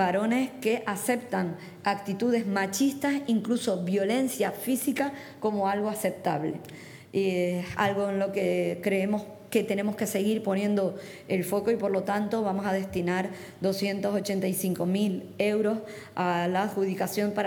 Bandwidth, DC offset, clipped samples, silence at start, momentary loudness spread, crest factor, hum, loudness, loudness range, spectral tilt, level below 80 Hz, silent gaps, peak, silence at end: 19.5 kHz; under 0.1%; under 0.1%; 0 s; 5 LU; 18 dB; none; -28 LUFS; 1 LU; -5.5 dB/octave; -68 dBFS; none; -10 dBFS; 0 s